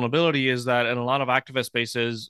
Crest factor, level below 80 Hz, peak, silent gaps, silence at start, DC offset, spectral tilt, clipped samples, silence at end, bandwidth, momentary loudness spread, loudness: 20 dB; -68 dBFS; -4 dBFS; none; 0 s; under 0.1%; -5 dB/octave; under 0.1%; 0 s; 12.5 kHz; 5 LU; -23 LUFS